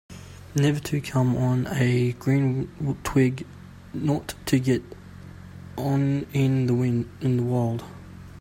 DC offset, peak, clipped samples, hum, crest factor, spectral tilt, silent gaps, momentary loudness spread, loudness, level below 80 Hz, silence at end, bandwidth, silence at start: under 0.1%; -8 dBFS; under 0.1%; none; 18 dB; -7 dB/octave; none; 20 LU; -25 LUFS; -50 dBFS; 0 s; 16 kHz; 0.1 s